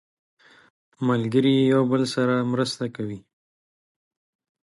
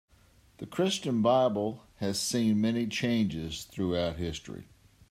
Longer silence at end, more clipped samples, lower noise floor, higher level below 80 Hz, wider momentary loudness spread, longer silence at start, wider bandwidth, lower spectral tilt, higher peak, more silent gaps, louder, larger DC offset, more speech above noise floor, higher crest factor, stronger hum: first, 1.45 s vs 0.5 s; neither; first, under -90 dBFS vs -61 dBFS; second, -66 dBFS vs -58 dBFS; about the same, 13 LU vs 13 LU; first, 1 s vs 0.6 s; second, 11.5 kHz vs 15.5 kHz; first, -6.5 dB/octave vs -5 dB/octave; first, -8 dBFS vs -12 dBFS; neither; first, -22 LUFS vs -30 LUFS; neither; first, over 68 dB vs 32 dB; about the same, 16 dB vs 18 dB; neither